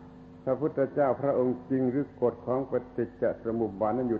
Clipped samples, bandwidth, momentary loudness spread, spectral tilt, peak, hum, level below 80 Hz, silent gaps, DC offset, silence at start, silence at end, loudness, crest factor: under 0.1%; 4.6 kHz; 6 LU; -11 dB/octave; -14 dBFS; none; -60 dBFS; none; under 0.1%; 0 s; 0 s; -29 LUFS; 14 dB